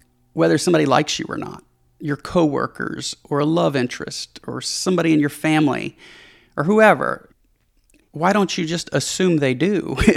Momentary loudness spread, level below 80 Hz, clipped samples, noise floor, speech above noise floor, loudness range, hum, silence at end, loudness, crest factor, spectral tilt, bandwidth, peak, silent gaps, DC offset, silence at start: 14 LU; -44 dBFS; under 0.1%; -61 dBFS; 42 dB; 3 LU; none; 0 s; -19 LUFS; 20 dB; -5 dB/octave; 15 kHz; 0 dBFS; none; under 0.1%; 0.35 s